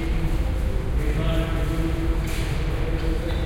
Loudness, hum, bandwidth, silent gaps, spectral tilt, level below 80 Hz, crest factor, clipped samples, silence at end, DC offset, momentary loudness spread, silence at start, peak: -26 LUFS; none; 16 kHz; none; -6.5 dB/octave; -24 dBFS; 12 dB; under 0.1%; 0 s; under 0.1%; 2 LU; 0 s; -10 dBFS